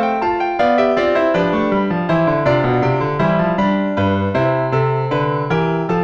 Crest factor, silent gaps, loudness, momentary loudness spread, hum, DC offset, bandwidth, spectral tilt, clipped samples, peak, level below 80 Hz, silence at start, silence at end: 12 dB; none; -16 LUFS; 3 LU; none; under 0.1%; 7.4 kHz; -8.5 dB/octave; under 0.1%; -4 dBFS; -44 dBFS; 0 s; 0 s